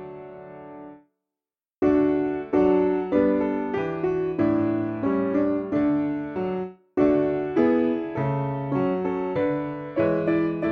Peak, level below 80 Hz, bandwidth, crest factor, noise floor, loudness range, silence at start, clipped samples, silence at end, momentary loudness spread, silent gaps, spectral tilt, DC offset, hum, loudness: -8 dBFS; -54 dBFS; 4.9 kHz; 16 dB; under -90 dBFS; 2 LU; 0 s; under 0.1%; 0 s; 9 LU; none; -10 dB/octave; under 0.1%; none; -24 LUFS